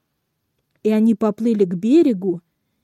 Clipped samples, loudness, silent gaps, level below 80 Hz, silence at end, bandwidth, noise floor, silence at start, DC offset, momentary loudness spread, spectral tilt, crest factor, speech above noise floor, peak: under 0.1%; -18 LUFS; none; -70 dBFS; 0.45 s; 11 kHz; -73 dBFS; 0.85 s; under 0.1%; 10 LU; -8.5 dB/octave; 14 dB; 56 dB; -6 dBFS